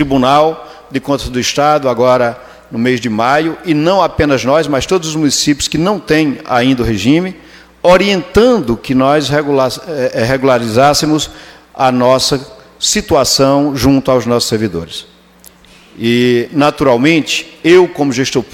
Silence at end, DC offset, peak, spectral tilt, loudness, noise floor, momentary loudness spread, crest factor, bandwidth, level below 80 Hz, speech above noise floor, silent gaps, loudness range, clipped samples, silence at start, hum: 0.1 s; under 0.1%; 0 dBFS; -4.5 dB/octave; -12 LUFS; -42 dBFS; 7 LU; 12 dB; 16.5 kHz; -36 dBFS; 31 dB; none; 2 LU; under 0.1%; 0 s; none